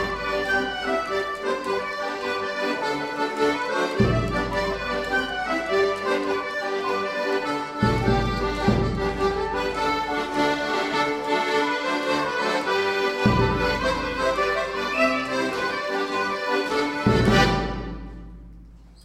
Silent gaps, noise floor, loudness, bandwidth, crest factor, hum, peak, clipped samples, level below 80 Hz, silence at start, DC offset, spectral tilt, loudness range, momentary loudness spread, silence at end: none; -46 dBFS; -24 LUFS; 15.5 kHz; 18 dB; none; -6 dBFS; under 0.1%; -40 dBFS; 0 s; under 0.1%; -5.5 dB/octave; 2 LU; 5 LU; 0 s